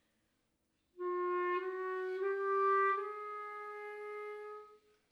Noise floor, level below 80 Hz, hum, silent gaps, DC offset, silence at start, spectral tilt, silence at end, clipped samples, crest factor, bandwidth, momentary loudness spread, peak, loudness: -80 dBFS; under -90 dBFS; none; none; under 0.1%; 0.95 s; -4.5 dB/octave; 0.35 s; under 0.1%; 16 dB; 5.8 kHz; 14 LU; -22 dBFS; -37 LUFS